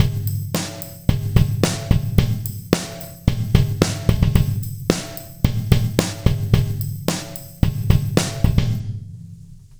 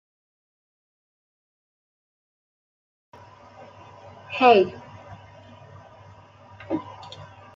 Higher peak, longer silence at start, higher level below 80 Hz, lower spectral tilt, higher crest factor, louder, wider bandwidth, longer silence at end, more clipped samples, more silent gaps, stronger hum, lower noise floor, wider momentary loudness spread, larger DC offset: about the same, 0 dBFS vs -2 dBFS; second, 0 s vs 4.3 s; first, -28 dBFS vs -68 dBFS; about the same, -6 dB/octave vs -6.5 dB/octave; second, 18 dB vs 26 dB; about the same, -21 LUFS vs -21 LUFS; first, over 20 kHz vs 7.4 kHz; second, 0.05 s vs 0.3 s; neither; neither; neither; second, -40 dBFS vs -49 dBFS; second, 9 LU vs 29 LU; neither